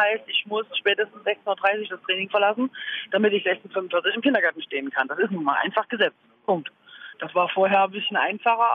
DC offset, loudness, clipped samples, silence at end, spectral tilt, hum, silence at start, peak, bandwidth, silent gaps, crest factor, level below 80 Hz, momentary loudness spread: under 0.1%; -23 LUFS; under 0.1%; 0 s; -7 dB/octave; none; 0 s; -6 dBFS; 5.2 kHz; none; 18 dB; -80 dBFS; 7 LU